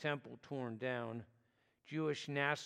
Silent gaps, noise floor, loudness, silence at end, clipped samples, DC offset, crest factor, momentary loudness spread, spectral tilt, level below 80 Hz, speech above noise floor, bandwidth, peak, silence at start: none; -77 dBFS; -42 LUFS; 0 s; under 0.1%; under 0.1%; 22 dB; 10 LU; -5.5 dB/octave; -86 dBFS; 36 dB; 12.5 kHz; -20 dBFS; 0 s